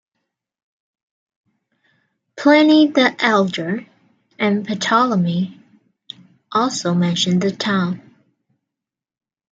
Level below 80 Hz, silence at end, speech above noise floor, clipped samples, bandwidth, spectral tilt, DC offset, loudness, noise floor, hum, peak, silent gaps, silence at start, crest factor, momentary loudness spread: -66 dBFS; 1.55 s; 69 dB; under 0.1%; 8.8 kHz; -5 dB/octave; under 0.1%; -17 LUFS; -86 dBFS; none; 0 dBFS; none; 2.35 s; 18 dB; 15 LU